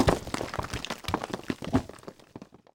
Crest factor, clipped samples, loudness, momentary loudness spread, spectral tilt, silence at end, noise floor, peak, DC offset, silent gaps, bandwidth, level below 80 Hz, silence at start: 24 dB; under 0.1%; -32 LUFS; 19 LU; -5.5 dB/octave; 0.3 s; -49 dBFS; -8 dBFS; under 0.1%; none; 19 kHz; -44 dBFS; 0 s